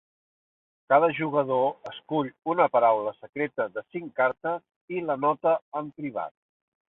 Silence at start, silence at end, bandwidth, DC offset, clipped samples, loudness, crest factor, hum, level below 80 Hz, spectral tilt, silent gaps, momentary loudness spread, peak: 0.9 s; 0.65 s; 4.1 kHz; under 0.1%; under 0.1%; -26 LUFS; 20 dB; none; -74 dBFS; -8.5 dB/octave; 4.76-4.88 s, 5.62-5.72 s; 14 LU; -8 dBFS